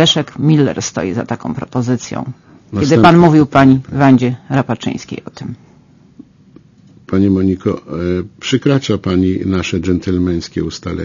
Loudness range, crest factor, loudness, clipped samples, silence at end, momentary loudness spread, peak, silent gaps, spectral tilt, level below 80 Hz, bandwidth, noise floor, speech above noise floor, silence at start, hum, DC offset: 8 LU; 14 dB; -14 LUFS; 0.2%; 0 s; 15 LU; 0 dBFS; none; -6 dB/octave; -42 dBFS; 7.4 kHz; -45 dBFS; 32 dB; 0 s; none; under 0.1%